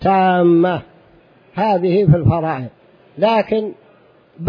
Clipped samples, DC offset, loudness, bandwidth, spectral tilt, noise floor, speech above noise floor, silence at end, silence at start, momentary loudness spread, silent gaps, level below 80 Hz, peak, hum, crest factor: under 0.1%; under 0.1%; -16 LUFS; 5.2 kHz; -10 dB/octave; -50 dBFS; 35 dB; 0 s; 0 s; 14 LU; none; -44 dBFS; -2 dBFS; none; 16 dB